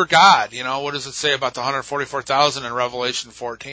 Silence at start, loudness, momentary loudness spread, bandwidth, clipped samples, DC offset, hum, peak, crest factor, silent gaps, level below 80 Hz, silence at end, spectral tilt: 0 s; -19 LUFS; 13 LU; 8 kHz; under 0.1%; under 0.1%; none; 0 dBFS; 18 dB; none; -58 dBFS; 0 s; -2 dB/octave